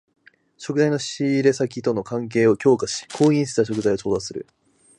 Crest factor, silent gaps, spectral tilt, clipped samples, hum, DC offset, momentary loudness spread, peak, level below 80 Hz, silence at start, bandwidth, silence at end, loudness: 18 dB; none; -5.5 dB/octave; under 0.1%; none; under 0.1%; 9 LU; -4 dBFS; -58 dBFS; 0.6 s; 11 kHz; 0.55 s; -21 LUFS